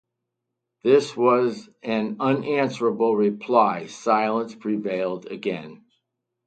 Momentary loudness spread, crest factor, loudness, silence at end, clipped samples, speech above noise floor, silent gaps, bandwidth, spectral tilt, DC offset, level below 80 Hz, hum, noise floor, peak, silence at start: 10 LU; 20 dB; -23 LUFS; 0.7 s; under 0.1%; 60 dB; none; 9 kHz; -6 dB/octave; under 0.1%; -72 dBFS; none; -82 dBFS; -4 dBFS; 0.85 s